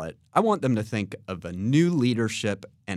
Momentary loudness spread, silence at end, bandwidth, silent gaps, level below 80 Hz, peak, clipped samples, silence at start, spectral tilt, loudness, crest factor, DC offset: 12 LU; 0 s; 13 kHz; none; -60 dBFS; -6 dBFS; under 0.1%; 0 s; -6.5 dB/octave; -25 LUFS; 18 dB; under 0.1%